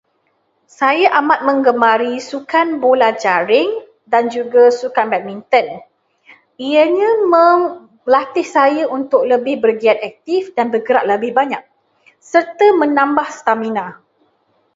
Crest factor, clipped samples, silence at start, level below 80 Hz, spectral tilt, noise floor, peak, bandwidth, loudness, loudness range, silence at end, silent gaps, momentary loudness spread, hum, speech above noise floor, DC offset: 14 dB; under 0.1%; 0.8 s; -66 dBFS; -4.5 dB/octave; -63 dBFS; 0 dBFS; 7.8 kHz; -14 LUFS; 3 LU; 0.85 s; none; 9 LU; none; 49 dB; under 0.1%